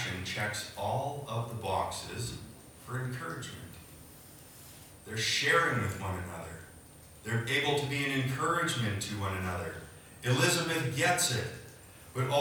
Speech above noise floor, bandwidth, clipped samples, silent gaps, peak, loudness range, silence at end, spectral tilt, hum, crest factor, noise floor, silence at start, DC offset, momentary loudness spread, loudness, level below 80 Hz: 21 dB; over 20 kHz; under 0.1%; none; -14 dBFS; 8 LU; 0 s; -3.5 dB/octave; none; 20 dB; -53 dBFS; 0 s; under 0.1%; 23 LU; -32 LUFS; -62 dBFS